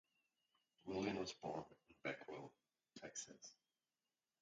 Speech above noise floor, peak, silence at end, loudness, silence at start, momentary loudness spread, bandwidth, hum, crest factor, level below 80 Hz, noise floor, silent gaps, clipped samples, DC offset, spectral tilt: over 37 dB; -32 dBFS; 0.9 s; -50 LUFS; 0.85 s; 17 LU; 8.8 kHz; none; 22 dB; -80 dBFS; under -90 dBFS; none; under 0.1%; under 0.1%; -4 dB/octave